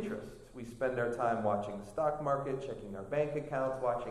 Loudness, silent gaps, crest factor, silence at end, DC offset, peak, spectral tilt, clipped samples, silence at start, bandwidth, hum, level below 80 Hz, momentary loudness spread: -35 LUFS; none; 16 dB; 0 s; under 0.1%; -20 dBFS; -7 dB/octave; under 0.1%; 0 s; 13 kHz; none; -58 dBFS; 11 LU